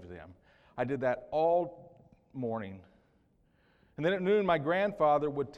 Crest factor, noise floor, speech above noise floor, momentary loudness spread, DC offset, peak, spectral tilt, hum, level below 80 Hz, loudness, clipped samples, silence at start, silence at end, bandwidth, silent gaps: 18 dB; -69 dBFS; 39 dB; 21 LU; under 0.1%; -16 dBFS; -8 dB/octave; none; -66 dBFS; -31 LUFS; under 0.1%; 0 s; 0 s; 7.6 kHz; none